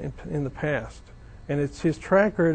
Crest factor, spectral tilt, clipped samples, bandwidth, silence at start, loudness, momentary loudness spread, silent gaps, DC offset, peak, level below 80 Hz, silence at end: 18 dB; -7.5 dB/octave; under 0.1%; 9.2 kHz; 0 s; -26 LUFS; 12 LU; none; under 0.1%; -8 dBFS; -46 dBFS; 0 s